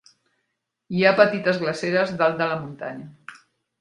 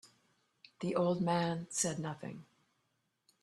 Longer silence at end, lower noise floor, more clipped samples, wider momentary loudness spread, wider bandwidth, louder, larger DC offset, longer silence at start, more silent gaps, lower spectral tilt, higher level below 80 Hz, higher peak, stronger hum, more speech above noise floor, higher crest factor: second, 0.45 s vs 1 s; about the same, -78 dBFS vs -81 dBFS; neither; first, 17 LU vs 14 LU; second, 10.5 kHz vs 13 kHz; first, -21 LUFS vs -35 LUFS; neither; first, 0.9 s vs 0.05 s; neither; about the same, -6 dB/octave vs -5 dB/octave; first, -66 dBFS vs -74 dBFS; first, 0 dBFS vs -18 dBFS; neither; first, 56 dB vs 46 dB; about the same, 24 dB vs 20 dB